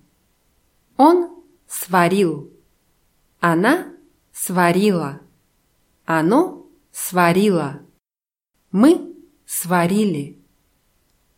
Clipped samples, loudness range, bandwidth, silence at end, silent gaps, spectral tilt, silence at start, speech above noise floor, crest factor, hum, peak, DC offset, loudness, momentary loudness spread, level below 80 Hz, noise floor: under 0.1%; 2 LU; 16.5 kHz; 1.05 s; none; -5.5 dB/octave; 1 s; over 74 dB; 18 dB; none; -2 dBFS; under 0.1%; -18 LUFS; 18 LU; -64 dBFS; under -90 dBFS